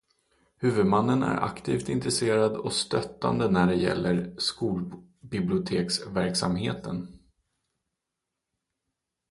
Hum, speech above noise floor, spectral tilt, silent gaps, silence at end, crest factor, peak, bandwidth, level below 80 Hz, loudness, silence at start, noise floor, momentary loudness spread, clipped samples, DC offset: none; 59 dB; -5 dB/octave; none; 2.15 s; 18 dB; -10 dBFS; 11.5 kHz; -54 dBFS; -27 LUFS; 0.6 s; -85 dBFS; 11 LU; under 0.1%; under 0.1%